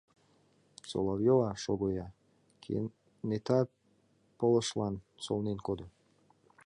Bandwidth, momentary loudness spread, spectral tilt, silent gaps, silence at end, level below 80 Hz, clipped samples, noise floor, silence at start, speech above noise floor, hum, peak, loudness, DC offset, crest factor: 11 kHz; 14 LU; -6.5 dB/octave; none; 0.75 s; -60 dBFS; under 0.1%; -70 dBFS; 0.85 s; 38 dB; none; -16 dBFS; -33 LUFS; under 0.1%; 20 dB